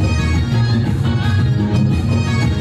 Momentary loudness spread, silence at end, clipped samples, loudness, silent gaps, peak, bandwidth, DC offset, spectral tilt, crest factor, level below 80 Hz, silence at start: 1 LU; 0 s; under 0.1%; -16 LUFS; none; -6 dBFS; 10.5 kHz; under 0.1%; -7 dB/octave; 10 dB; -26 dBFS; 0 s